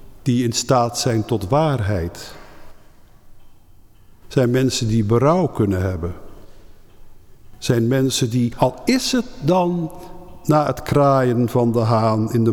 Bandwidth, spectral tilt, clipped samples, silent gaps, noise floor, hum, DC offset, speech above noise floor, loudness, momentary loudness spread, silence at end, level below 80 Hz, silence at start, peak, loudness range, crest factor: 18 kHz; -6 dB/octave; under 0.1%; none; -46 dBFS; none; under 0.1%; 28 dB; -19 LUFS; 12 LU; 0 s; -42 dBFS; 0 s; -4 dBFS; 5 LU; 16 dB